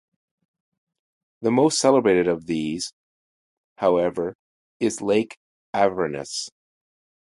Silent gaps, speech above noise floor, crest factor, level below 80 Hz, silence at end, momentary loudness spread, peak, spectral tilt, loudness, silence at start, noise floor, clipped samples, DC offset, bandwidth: 2.93-3.76 s, 4.35-4.80 s, 5.37-5.73 s; over 69 dB; 20 dB; -60 dBFS; 0.75 s; 13 LU; -4 dBFS; -4.5 dB/octave; -22 LUFS; 1.4 s; under -90 dBFS; under 0.1%; under 0.1%; 11.5 kHz